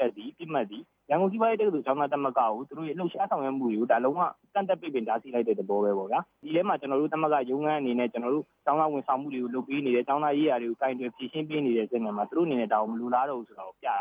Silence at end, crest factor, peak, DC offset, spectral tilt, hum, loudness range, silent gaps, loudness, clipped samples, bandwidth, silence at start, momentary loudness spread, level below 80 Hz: 0 s; 16 dB; -12 dBFS; under 0.1%; -9 dB/octave; none; 1 LU; none; -28 LUFS; under 0.1%; 4.9 kHz; 0 s; 7 LU; -82 dBFS